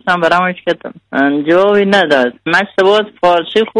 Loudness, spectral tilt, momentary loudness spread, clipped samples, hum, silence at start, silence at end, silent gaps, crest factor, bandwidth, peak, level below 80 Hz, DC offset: -12 LUFS; -5.5 dB/octave; 8 LU; under 0.1%; none; 0.05 s; 0 s; none; 12 dB; 11 kHz; 0 dBFS; -52 dBFS; under 0.1%